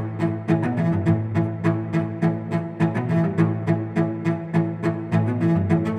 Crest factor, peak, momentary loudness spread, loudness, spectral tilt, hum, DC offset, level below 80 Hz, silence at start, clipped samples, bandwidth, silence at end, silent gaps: 16 dB; -6 dBFS; 5 LU; -23 LUFS; -9.5 dB/octave; none; under 0.1%; -58 dBFS; 0 s; under 0.1%; 8.2 kHz; 0 s; none